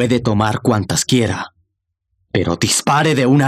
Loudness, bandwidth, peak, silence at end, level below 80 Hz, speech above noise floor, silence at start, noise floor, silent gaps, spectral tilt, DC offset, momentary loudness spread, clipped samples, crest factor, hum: -16 LUFS; 15 kHz; -2 dBFS; 0 s; -46 dBFS; 58 dB; 0 s; -73 dBFS; none; -4.5 dB/octave; under 0.1%; 8 LU; under 0.1%; 14 dB; none